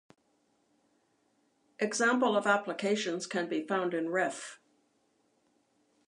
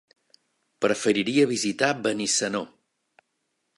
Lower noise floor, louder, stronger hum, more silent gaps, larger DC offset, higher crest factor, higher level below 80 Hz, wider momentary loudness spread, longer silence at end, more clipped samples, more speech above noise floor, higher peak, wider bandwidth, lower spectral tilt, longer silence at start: second, -73 dBFS vs -77 dBFS; second, -31 LUFS vs -24 LUFS; neither; neither; neither; about the same, 22 dB vs 22 dB; second, -88 dBFS vs -70 dBFS; about the same, 8 LU vs 7 LU; first, 1.55 s vs 1.1 s; neither; second, 43 dB vs 53 dB; second, -12 dBFS vs -6 dBFS; about the same, 11.5 kHz vs 11.5 kHz; about the same, -3.5 dB/octave vs -3 dB/octave; first, 1.8 s vs 0.8 s